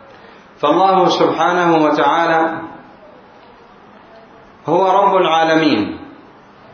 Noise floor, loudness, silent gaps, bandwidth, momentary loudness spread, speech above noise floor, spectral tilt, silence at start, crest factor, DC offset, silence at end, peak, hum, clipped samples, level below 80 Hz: -42 dBFS; -14 LUFS; none; 6.8 kHz; 13 LU; 29 dB; -5.5 dB/octave; 0.6 s; 16 dB; under 0.1%; 0.6 s; 0 dBFS; none; under 0.1%; -58 dBFS